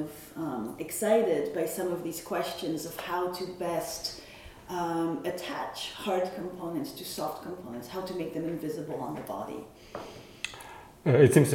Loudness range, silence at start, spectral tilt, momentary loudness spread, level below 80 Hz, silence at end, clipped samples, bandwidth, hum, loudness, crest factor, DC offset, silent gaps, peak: 6 LU; 0 s; -5.5 dB/octave; 14 LU; -62 dBFS; 0 s; under 0.1%; 17 kHz; none; -31 LUFS; 24 dB; under 0.1%; none; -8 dBFS